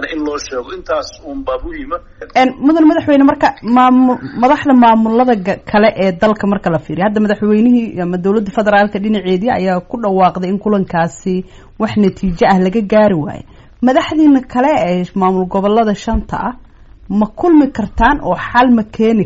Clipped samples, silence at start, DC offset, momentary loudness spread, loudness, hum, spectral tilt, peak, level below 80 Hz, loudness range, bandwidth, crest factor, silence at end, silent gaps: under 0.1%; 0 s; under 0.1%; 11 LU; -13 LUFS; none; -5.5 dB/octave; 0 dBFS; -34 dBFS; 4 LU; 8 kHz; 12 dB; 0 s; none